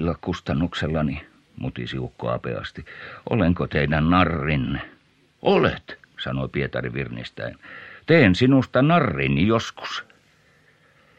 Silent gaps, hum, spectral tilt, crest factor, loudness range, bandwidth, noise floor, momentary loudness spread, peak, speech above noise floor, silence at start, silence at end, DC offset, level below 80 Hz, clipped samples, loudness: none; none; -7 dB/octave; 22 dB; 6 LU; 8.4 kHz; -58 dBFS; 17 LU; -2 dBFS; 36 dB; 0 s; 1.15 s; under 0.1%; -42 dBFS; under 0.1%; -22 LUFS